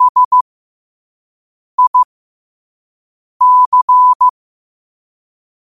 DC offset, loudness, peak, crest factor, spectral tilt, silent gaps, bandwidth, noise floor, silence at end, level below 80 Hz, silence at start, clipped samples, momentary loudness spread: 0.3%; -10 LUFS; -4 dBFS; 12 dB; -1 dB/octave; 0.09-0.15 s, 0.25-0.31 s, 0.41-1.78 s, 1.87-1.94 s, 2.05-3.40 s, 3.66-3.72 s, 3.82-3.88 s, 4.15-4.20 s; 1.4 kHz; under -90 dBFS; 1.4 s; -68 dBFS; 0 s; under 0.1%; 9 LU